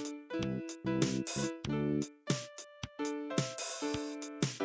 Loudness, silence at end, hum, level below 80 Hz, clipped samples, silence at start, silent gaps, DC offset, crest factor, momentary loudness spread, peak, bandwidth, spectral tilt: -37 LUFS; 0 s; none; -60 dBFS; under 0.1%; 0 s; none; under 0.1%; 20 dB; 7 LU; -16 dBFS; 8 kHz; -4.5 dB/octave